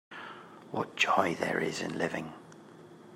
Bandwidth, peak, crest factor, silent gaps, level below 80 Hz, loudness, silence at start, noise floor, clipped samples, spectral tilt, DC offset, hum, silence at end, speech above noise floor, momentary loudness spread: 16 kHz; -10 dBFS; 24 dB; none; -76 dBFS; -31 LUFS; 0.1 s; -52 dBFS; under 0.1%; -4 dB/octave; under 0.1%; none; 0 s; 21 dB; 25 LU